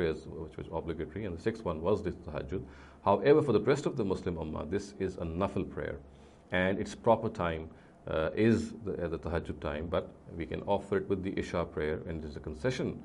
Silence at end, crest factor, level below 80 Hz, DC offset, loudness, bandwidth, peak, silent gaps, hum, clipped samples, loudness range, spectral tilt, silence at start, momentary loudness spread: 0 s; 20 dB; -52 dBFS; under 0.1%; -33 LUFS; 11.5 kHz; -12 dBFS; none; none; under 0.1%; 4 LU; -7 dB/octave; 0 s; 12 LU